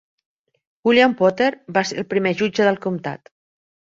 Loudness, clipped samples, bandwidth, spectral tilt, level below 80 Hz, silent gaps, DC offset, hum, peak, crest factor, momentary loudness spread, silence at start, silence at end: -19 LUFS; under 0.1%; 7.8 kHz; -5 dB/octave; -62 dBFS; none; under 0.1%; none; -2 dBFS; 18 dB; 11 LU; 0.85 s; 0.7 s